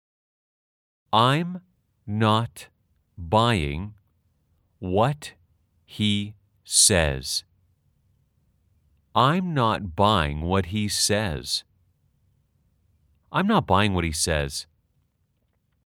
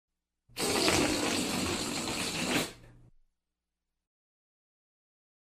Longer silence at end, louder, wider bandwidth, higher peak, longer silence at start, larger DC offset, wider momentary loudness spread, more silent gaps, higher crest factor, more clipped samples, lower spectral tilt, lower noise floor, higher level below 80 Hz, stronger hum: second, 1.25 s vs 2.6 s; first, -23 LUFS vs -30 LUFS; first, 18 kHz vs 16 kHz; first, -4 dBFS vs -10 dBFS; first, 1.1 s vs 0.55 s; neither; first, 15 LU vs 8 LU; neither; about the same, 22 dB vs 24 dB; neither; first, -4 dB/octave vs -2.5 dB/octave; second, -70 dBFS vs -87 dBFS; first, -46 dBFS vs -58 dBFS; neither